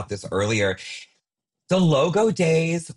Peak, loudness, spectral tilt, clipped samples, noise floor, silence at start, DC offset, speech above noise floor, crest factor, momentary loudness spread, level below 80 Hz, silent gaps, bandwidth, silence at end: -10 dBFS; -21 LUFS; -5.5 dB/octave; under 0.1%; -81 dBFS; 0 s; under 0.1%; 60 dB; 14 dB; 13 LU; -58 dBFS; none; 11.5 kHz; 0.05 s